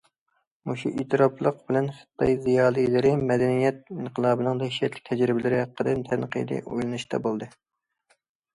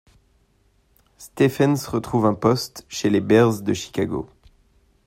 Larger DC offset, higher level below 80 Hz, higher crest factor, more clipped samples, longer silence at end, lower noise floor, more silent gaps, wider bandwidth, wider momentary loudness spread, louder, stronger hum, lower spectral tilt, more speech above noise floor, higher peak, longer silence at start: neither; about the same, -56 dBFS vs -54 dBFS; about the same, 18 dB vs 20 dB; neither; first, 1.05 s vs 0.8 s; first, -75 dBFS vs -62 dBFS; neither; second, 11.5 kHz vs 16 kHz; second, 9 LU vs 13 LU; second, -25 LUFS vs -21 LUFS; neither; about the same, -7 dB/octave vs -6 dB/octave; first, 50 dB vs 42 dB; second, -6 dBFS vs -2 dBFS; second, 0.65 s vs 1.2 s